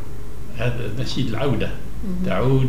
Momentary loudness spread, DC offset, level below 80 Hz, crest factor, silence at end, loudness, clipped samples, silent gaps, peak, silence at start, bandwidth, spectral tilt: 13 LU; 9%; -34 dBFS; 16 dB; 0 s; -25 LUFS; under 0.1%; none; -6 dBFS; 0 s; 15.5 kHz; -7 dB/octave